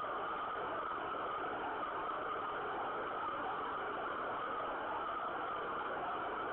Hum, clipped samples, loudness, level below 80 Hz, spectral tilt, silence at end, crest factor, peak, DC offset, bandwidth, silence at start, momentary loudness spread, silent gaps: none; under 0.1%; -40 LUFS; -68 dBFS; -1.5 dB/octave; 0 s; 10 dB; -30 dBFS; under 0.1%; 4.3 kHz; 0 s; 0 LU; none